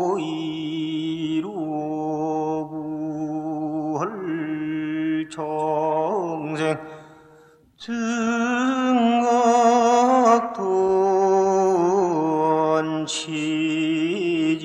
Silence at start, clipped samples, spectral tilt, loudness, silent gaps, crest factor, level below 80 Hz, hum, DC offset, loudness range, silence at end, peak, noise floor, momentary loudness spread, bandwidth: 0 s; under 0.1%; -5 dB/octave; -22 LUFS; none; 18 dB; -64 dBFS; none; under 0.1%; 8 LU; 0 s; -4 dBFS; -53 dBFS; 11 LU; 10.5 kHz